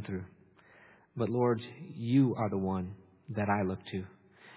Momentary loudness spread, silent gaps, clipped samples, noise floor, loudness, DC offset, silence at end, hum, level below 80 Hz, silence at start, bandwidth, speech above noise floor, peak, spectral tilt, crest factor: 19 LU; none; under 0.1%; -60 dBFS; -33 LUFS; under 0.1%; 0 s; none; -58 dBFS; 0 s; 4 kHz; 29 dB; -16 dBFS; -7.5 dB/octave; 18 dB